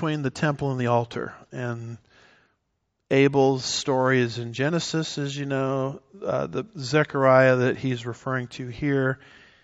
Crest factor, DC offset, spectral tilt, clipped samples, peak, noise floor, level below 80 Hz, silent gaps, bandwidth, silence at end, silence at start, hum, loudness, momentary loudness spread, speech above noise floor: 20 dB; under 0.1%; -5 dB/octave; under 0.1%; -4 dBFS; -76 dBFS; -60 dBFS; none; 8 kHz; 0.5 s; 0 s; none; -24 LUFS; 14 LU; 52 dB